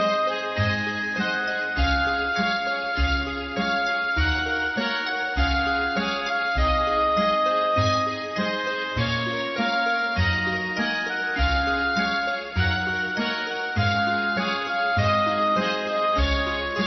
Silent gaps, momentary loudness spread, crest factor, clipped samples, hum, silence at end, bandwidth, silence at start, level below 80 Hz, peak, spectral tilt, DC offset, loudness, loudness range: none; 4 LU; 14 dB; under 0.1%; none; 0 s; 6.2 kHz; 0 s; -34 dBFS; -10 dBFS; -5.5 dB/octave; under 0.1%; -23 LUFS; 1 LU